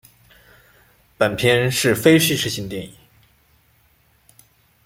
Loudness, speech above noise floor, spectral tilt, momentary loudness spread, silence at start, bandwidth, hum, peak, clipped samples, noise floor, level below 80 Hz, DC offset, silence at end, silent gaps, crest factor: -18 LUFS; 41 dB; -4 dB/octave; 17 LU; 1.2 s; 16.5 kHz; none; -2 dBFS; under 0.1%; -59 dBFS; -54 dBFS; under 0.1%; 1.95 s; none; 20 dB